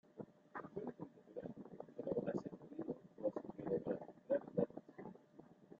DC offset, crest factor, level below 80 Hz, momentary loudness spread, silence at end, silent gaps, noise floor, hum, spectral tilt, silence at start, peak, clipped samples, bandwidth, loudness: under 0.1%; 24 dB; -80 dBFS; 15 LU; 0 s; none; -64 dBFS; none; -8.5 dB/octave; 0.15 s; -22 dBFS; under 0.1%; 7.4 kHz; -46 LUFS